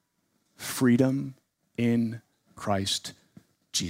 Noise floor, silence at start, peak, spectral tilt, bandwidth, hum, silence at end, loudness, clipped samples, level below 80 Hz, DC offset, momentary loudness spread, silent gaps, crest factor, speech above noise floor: -74 dBFS; 0.6 s; -10 dBFS; -4.5 dB/octave; 16 kHz; none; 0 s; -27 LUFS; under 0.1%; -68 dBFS; under 0.1%; 17 LU; none; 20 dB; 48 dB